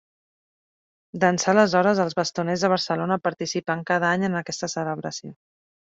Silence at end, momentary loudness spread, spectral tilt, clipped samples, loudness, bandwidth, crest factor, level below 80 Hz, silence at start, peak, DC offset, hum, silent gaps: 0.55 s; 10 LU; -4.5 dB/octave; under 0.1%; -23 LUFS; 7.8 kHz; 20 dB; -66 dBFS; 1.15 s; -4 dBFS; under 0.1%; none; none